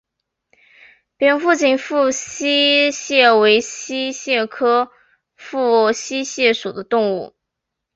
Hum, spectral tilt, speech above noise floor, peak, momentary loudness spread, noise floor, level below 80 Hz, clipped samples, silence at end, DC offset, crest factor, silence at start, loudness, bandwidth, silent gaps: none; -2 dB/octave; 63 dB; 0 dBFS; 11 LU; -80 dBFS; -64 dBFS; under 0.1%; 0.7 s; under 0.1%; 18 dB; 1.2 s; -16 LUFS; 8 kHz; none